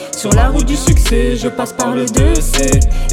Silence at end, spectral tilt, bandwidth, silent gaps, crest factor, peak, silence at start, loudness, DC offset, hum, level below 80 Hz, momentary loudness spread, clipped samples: 0 s; -5 dB/octave; 16 kHz; none; 12 dB; 0 dBFS; 0 s; -14 LUFS; under 0.1%; none; -14 dBFS; 5 LU; under 0.1%